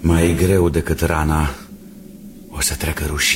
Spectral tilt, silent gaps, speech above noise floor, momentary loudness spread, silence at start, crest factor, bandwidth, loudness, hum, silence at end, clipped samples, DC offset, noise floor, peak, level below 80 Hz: -4.5 dB/octave; none; 21 dB; 23 LU; 0 s; 16 dB; 16.5 kHz; -18 LUFS; none; 0 s; under 0.1%; under 0.1%; -38 dBFS; -2 dBFS; -28 dBFS